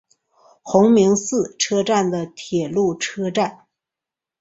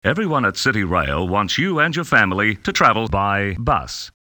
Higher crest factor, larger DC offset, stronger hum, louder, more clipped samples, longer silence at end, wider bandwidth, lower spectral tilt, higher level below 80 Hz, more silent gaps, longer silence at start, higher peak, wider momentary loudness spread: about the same, 18 dB vs 18 dB; neither; neither; about the same, -19 LUFS vs -18 LUFS; neither; first, 0.85 s vs 0.1 s; second, 8 kHz vs over 20 kHz; about the same, -4.5 dB/octave vs -4.5 dB/octave; second, -60 dBFS vs -38 dBFS; neither; first, 0.65 s vs 0.05 s; about the same, -2 dBFS vs 0 dBFS; first, 10 LU vs 5 LU